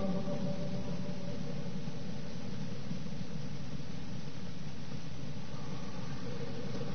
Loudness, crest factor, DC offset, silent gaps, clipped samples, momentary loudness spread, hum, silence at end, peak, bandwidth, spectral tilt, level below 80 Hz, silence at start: -42 LUFS; 16 dB; 2%; none; under 0.1%; 6 LU; none; 0 s; -22 dBFS; 6.6 kHz; -6.5 dB/octave; -56 dBFS; 0 s